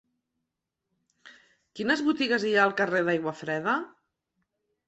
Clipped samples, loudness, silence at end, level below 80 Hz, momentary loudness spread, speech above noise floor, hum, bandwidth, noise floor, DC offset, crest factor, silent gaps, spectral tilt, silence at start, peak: under 0.1%; -26 LUFS; 1 s; -74 dBFS; 8 LU; 58 dB; none; 8.2 kHz; -85 dBFS; under 0.1%; 22 dB; none; -5 dB/octave; 1.25 s; -8 dBFS